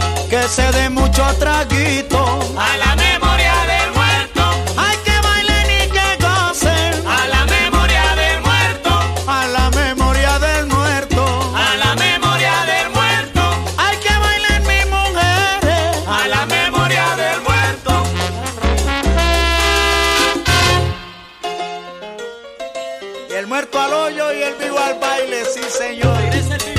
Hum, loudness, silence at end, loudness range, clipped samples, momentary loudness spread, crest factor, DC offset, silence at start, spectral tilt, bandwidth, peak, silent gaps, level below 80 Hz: none; -14 LUFS; 0 s; 5 LU; under 0.1%; 7 LU; 14 dB; under 0.1%; 0 s; -3.5 dB/octave; 15.5 kHz; 0 dBFS; none; -22 dBFS